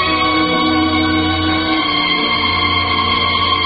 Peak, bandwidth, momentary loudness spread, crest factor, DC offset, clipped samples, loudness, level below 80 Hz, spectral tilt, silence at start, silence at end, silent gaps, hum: -2 dBFS; 5.2 kHz; 2 LU; 12 dB; under 0.1%; under 0.1%; -14 LUFS; -32 dBFS; -10 dB/octave; 0 s; 0 s; none; none